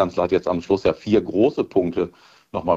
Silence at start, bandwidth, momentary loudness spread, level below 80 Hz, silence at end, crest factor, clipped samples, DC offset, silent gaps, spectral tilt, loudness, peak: 0 s; 7.6 kHz; 9 LU; -50 dBFS; 0 s; 16 dB; under 0.1%; under 0.1%; none; -7.5 dB/octave; -21 LUFS; -4 dBFS